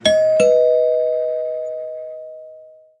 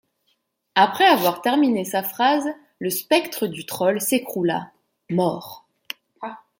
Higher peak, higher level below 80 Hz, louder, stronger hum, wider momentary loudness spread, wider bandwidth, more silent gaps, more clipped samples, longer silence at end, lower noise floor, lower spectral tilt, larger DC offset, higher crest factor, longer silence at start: about the same, -2 dBFS vs -2 dBFS; first, -58 dBFS vs -72 dBFS; first, -17 LUFS vs -21 LUFS; neither; about the same, 20 LU vs 19 LU; second, 11 kHz vs 17 kHz; neither; neither; about the same, 0.35 s vs 0.25 s; second, -43 dBFS vs -70 dBFS; about the same, -3 dB/octave vs -4 dB/octave; neither; about the same, 16 dB vs 20 dB; second, 0.05 s vs 0.75 s